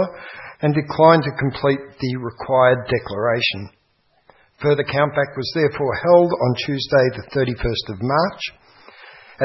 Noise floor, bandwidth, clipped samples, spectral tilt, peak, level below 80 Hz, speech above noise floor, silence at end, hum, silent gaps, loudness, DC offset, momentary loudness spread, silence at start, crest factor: -63 dBFS; 6 kHz; under 0.1%; -7.5 dB/octave; 0 dBFS; -44 dBFS; 44 dB; 0 s; none; none; -19 LUFS; under 0.1%; 11 LU; 0 s; 20 dB